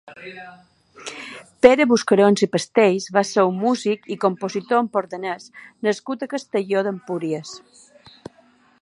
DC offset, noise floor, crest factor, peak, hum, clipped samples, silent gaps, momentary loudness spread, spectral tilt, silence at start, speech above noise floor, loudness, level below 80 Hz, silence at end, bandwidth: under 0.1%; -56 dBFS; 20 dB; 0 dBFS; none; under 0.1%; none; 21 LU; -5 dB/octave; 0.05 s; 36 dB; -20 LUFS; -62 dBFS; 1.25 s; 11.5 kHz